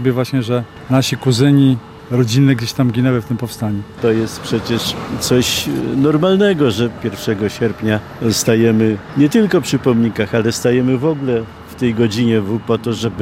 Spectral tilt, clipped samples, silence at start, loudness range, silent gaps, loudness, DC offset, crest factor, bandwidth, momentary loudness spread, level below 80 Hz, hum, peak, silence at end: -5.5 dB/octave; under 0.1%; 0 s; 2 LU; none; -16 LUFS; under 0.1%; 16 dB; 16 kHz; 8 LU; -46 dBFS; none; 0 dBFS; 0 s